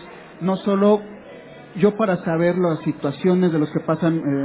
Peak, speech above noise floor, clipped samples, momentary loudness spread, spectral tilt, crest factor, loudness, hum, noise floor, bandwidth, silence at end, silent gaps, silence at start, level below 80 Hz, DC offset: -4 dBFS; 21 dB; under 0.1%; 20 LU; -12 dB/octave; 16 dB; -20 LUFS; none; -40 dBFS; 4 kHz; 0 s; none; 0 s; -60 dBFS; under 0.1%